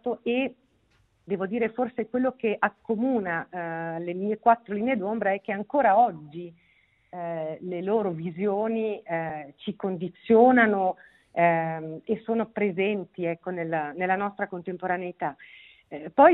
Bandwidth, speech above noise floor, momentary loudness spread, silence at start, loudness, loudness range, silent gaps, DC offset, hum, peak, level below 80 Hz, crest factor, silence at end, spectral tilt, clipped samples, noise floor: 4.1 kHz; 40 dB; 13 LU; 0.05 s; -26 LUFS; 6 LU; none; under 0.1%; none; -4 dBFS; -70 dBFS; 22 dB; 0 s; -10 dB/octave; under 0.1%; -66 dBFS